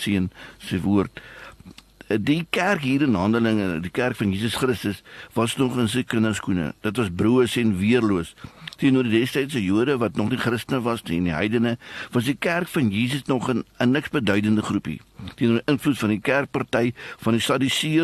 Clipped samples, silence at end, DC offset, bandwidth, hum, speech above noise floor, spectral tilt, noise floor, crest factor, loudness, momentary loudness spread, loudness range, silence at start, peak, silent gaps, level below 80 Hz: under 0.1%; 0 s; under 0.1%; 13 kHz; none; 24 dB; -5.5 dB/octave; -46 dBFS; 18 dB; -23 LUFS; 9 LU; 2 LU; 0 s; -4 dBFS; none; -52 dBFS